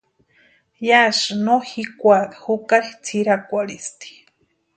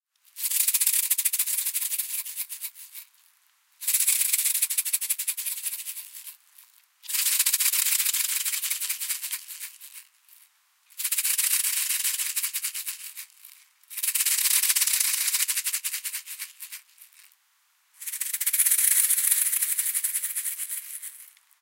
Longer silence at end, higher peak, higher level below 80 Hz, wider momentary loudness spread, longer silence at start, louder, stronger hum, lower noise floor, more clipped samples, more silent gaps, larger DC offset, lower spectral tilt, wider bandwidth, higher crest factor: first, 0.65 s vs 0.35 s; first, 0 dBFS vs -4 dBFS; first, -68 dBFS vs under -90 dBFS; about the same, 16 LU vs 18 LU; first, 0.8 s vs 0.35 s; first, -18 LUFS vs -23 LUFS; neither; second, -63 dBFS vs -67 dBFS; neither; neither; neither; first, -3.5 dB/octave vs 13 dB/octave; second, 9.4 kHz vs 17 kHz; about the same, 20 dB vs 24 dB